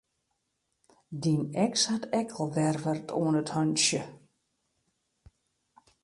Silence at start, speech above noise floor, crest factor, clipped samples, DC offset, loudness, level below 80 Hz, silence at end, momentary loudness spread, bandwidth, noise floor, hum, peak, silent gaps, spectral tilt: 1.1 s; 51 dB; 18 dB; under 0.1%; under 0.1%; -28 LUFS; -70 dBFS; 1.85 s; 8 LU; 11.5 kHz; -80 dBFS; none; -12 dBFS; none; -4 dB/octave